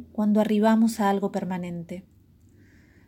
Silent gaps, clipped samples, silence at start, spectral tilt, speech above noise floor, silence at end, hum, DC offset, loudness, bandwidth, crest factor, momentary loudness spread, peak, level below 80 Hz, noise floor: none; under 0.1%; 0 s; -6.5 dB/octave; 32 dB; 1.05 s; none; under 0.1%; -24 LUFS; 16.5 kHz; 16 dB; 16 LU; -10 dBFS; -62 dBFS; -55 dBFS